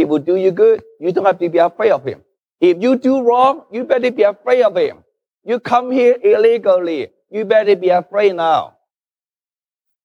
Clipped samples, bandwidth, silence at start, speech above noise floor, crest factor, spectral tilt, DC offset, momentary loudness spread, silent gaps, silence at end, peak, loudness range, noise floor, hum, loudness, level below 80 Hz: under 0.1%; 7.4 kHz; 0 s; over 76 dB; 14 dB; -6.5 dB/octave; under 0.1%; 10 LU; none; 1.4 s; -2 dBFS; 1 LU; under -90 dBFS; none; -15 LUFS; -70 dBFS